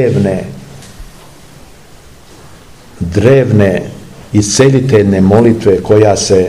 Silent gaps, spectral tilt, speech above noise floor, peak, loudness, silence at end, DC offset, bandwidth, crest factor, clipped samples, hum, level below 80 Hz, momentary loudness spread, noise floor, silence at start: none; -6 dB/octave; 29 dB; 0 dBFS; -9 LUFS; 0 s; 0.9%; 14 kHz; 10 dB; 2%; none; -36 dBFS; 16 LU; -38 dBFS; 0 s